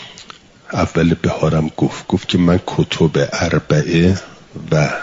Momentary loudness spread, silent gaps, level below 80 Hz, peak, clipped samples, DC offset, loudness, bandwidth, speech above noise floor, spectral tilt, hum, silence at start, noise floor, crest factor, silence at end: 10 LU; none; -42 dBFS; -2 dBFS; under 0.1%; under 0.1%; -16 LUFS; 7.8 kHz; 25 dB; -6.5 dB/octave; none; 0 s; -40 dBFS; 14 dB; 0 s